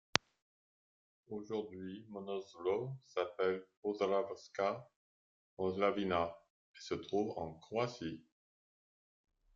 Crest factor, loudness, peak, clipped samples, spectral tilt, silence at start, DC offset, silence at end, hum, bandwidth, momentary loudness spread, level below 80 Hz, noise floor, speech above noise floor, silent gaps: 38 dB; -39 LUFS; -2 dBFS; under 0.1%; -3.5 dB/octave; 1.3 s; under 0.1%; 1.35 s; none; 7.6 kHz; 12 LU; -76 dBFS; under -90 dBFS; over 51 dB; 3.77-3.82 s, 4.96-5.57 s, 6.50-6.74 s